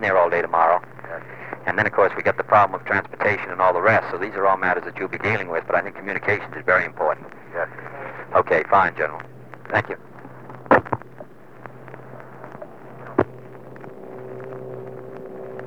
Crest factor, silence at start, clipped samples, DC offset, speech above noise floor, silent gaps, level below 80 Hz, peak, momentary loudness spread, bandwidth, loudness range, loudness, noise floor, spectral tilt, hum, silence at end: 22 dB; 0 s; under 0.1%; 0.6%; 22 dB; none; -62 dBFS; -2 dBFS; 22 LU; 8.2 kHz; 12 LU; -21 LUFS; -43 dBFS; -7 dB/octave; none; 0 s